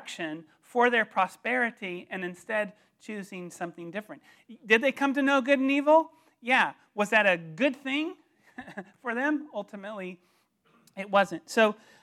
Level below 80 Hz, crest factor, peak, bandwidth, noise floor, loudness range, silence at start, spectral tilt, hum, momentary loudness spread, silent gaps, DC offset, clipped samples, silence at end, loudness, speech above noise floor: -84 dBFS; 22 dB; -6 dBFS; 14.5 kHz; -66 dBFS; 9 LU; 0 s; -4.5 dB/octave; none; 17 LU; none; under 0.1%; under 0.1%; 0.3 s; -27 LUFS; 38 dB